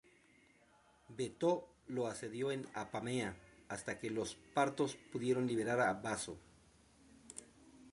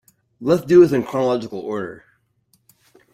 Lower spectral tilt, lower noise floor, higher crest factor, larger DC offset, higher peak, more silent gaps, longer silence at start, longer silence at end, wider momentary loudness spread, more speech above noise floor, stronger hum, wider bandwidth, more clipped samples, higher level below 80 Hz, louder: second, -5 dB/octave vs -7.5 dB/octave; first, -69 dBFS vs -64 dBFS; about the same, 22 dB vs 18 dB; neither; second, -20 dBFS vs -2 dBFS; neither; first, 1.1 s vs 0.4 s; second, 0 s vs 1.2 s; first, 18 LU vs 15 LU; second, 30 dB vs 46 dB; neither; second, 11.5 kHz vs 14 kHz; neither; second, -72 dBFS vs -58 dBFS; second, -39 LUFS vs -18 LUFS